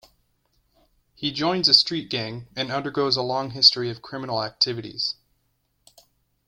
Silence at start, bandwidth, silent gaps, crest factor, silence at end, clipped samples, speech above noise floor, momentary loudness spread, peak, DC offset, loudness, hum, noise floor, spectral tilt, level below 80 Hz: 1.2 s; 16.5 kHz; none; 24 dB; 1.35 s; under 0.1%; 47 dB; 14 LU; -2 dBFS; under 0.1%; -21 LUFS; none; -71 dBFS; -4 dB/octave; -62 dBFS